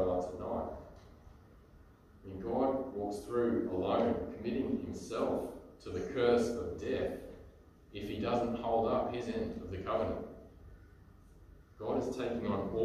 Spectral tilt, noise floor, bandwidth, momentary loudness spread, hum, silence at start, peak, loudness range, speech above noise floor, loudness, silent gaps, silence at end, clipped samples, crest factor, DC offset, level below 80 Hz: -6.5 dB/octave; -59 dBFS; 14 kHz; 17 LU; none; 0 s; -16 dBFS; 5 LU; 25 dB; -36 LUFS; none; 0 s; under 0.1%; 20 dB; under 0.1%; -56 dBFS